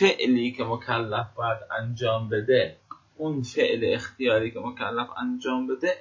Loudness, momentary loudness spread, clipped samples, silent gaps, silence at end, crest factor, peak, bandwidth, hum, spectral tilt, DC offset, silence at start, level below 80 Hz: -26 LUFS; 8 LU; under 0.1%; none; 0 s; 18 dB; -8 dBFS; 7.6 kHz; none; -6 dB/octave; under 0.1%; 0 s; -60 dBFS